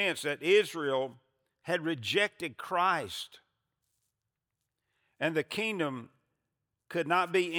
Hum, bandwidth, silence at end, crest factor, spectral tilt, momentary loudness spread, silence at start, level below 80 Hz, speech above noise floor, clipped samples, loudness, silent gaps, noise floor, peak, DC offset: none; over 20 kHz; 0 s; 20 dB; -4 dB/octave; 14 LU; 0 s; -82 dBFS; 56 dB; under 0.1%; -31 LUFS; none; -87 dBFS; -12 dBFS; under 0.1%